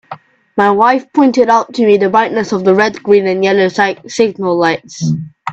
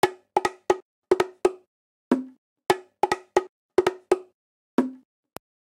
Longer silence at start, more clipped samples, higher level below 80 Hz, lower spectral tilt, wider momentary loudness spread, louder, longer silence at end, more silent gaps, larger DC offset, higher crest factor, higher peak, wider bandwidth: about the same, 0.1 s vs 0.05 s; neither; first, -54 dBFS vs -64 dBFS; about the same, -5.5 dB/octave vs -4.5 dB/octave; first, 8 LU vs 3 LU; first, -12 LUFS vs -26 LUFS; second, 0 s vs 0.65 s; second, none vs 0.82-1.02 s, 1.67-2.11 s, 2.38-2.56 s, 3.49-3.69 s, 4.34-4.78 s; neither; second, 12 dB vs 20 dB; first, 0 dBFS vs -6 dBFS; second, 8.2 kHz vs 16.5 kHz